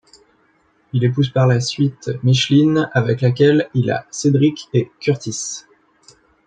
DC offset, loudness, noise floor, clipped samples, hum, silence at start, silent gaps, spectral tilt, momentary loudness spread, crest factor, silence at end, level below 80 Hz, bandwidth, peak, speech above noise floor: under 0.1%; -17 LUFS; -59 dBFS; under 0.1%; none; 0.95 s; none; -6 dB/octave; 8 LU; 16 dB; 0.85 s; -56 dBFS; 9.2 kHz; -2 dBFS; 42 dB